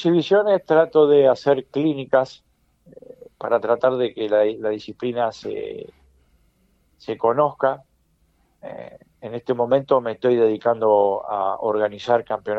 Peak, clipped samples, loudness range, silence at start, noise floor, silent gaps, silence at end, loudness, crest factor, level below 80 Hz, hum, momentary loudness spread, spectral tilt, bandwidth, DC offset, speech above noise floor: -4 dBFS; under 0.1%; 7 LU; 0 s; -63 dBFS; none; 0 s; -20 LUFS; 18 dB; -64 dBFS; none; 16 LU; -7 dB/octave; 7.6 kHz; under 0.1%; 43 dB